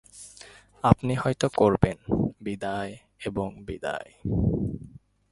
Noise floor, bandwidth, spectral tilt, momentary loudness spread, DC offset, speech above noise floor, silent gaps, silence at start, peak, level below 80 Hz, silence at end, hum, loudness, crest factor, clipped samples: -51 dBFS; 11.5 kHz; -7 dB/octave; 17 LU; under 0.1%; 25 dB; none; 0.15 s; 0 dBFS; -42 dBFS; 0.4 s; 50 Hz at -50 dBFS; -27 LUFS; 26 dB; under 0.1%